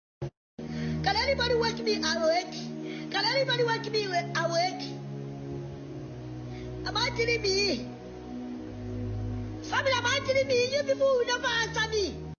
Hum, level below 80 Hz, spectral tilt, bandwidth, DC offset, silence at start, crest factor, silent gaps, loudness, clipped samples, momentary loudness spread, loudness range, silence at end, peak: none; -50 dBFS; -4 dB/octave; 7 kHz; under 0.1%; 0.2 s; 16 dB; 0.37-0.57 s; -28 LUFS; under 0.1%; 15 LU; 4 LU; 0.05 s; -12 dBFS